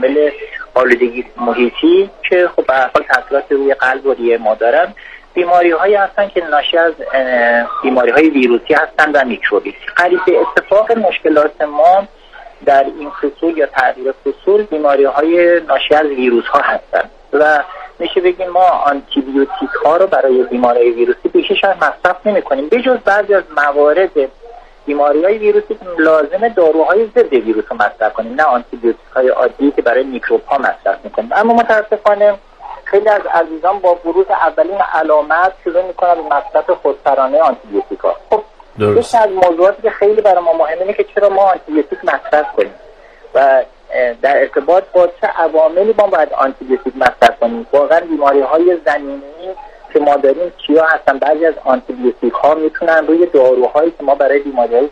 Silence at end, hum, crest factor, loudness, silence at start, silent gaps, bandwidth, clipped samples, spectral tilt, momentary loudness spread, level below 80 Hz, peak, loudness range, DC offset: 0 s; none; 12 dB; -12 LUFS; 0 s; none; 10 kHz; 0.1%; -5.5 dB/octave; 7 LU; -46 dBFS; 0 dBFS; 2 LU; under 0.1%